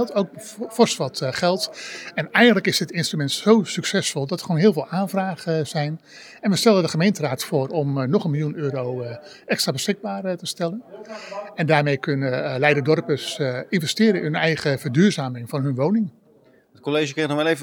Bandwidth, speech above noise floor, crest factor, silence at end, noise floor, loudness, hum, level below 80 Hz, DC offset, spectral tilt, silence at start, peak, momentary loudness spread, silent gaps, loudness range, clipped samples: 19.5 kHz; 34 dB; 20 dB; 0 s; -55 dBFS; -21 LUFS; none; -72 dBFS; under 0.1%; -5 dB/octave; 0 s; -2 dBFS; 11 LU; none; 4 LU; under 0.1%